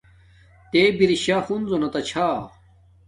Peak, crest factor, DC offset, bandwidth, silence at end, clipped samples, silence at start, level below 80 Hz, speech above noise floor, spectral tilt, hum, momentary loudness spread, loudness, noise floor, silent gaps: -4 dBFS; 18 dB; under 0.1%; 11.5 kHz; 0.6 s; under 0.1%; 0.75 s; -54 dBFS; 33 dB; -5 dB/octave; none; 8 LU; -21 LUFS; -53 dBFS; none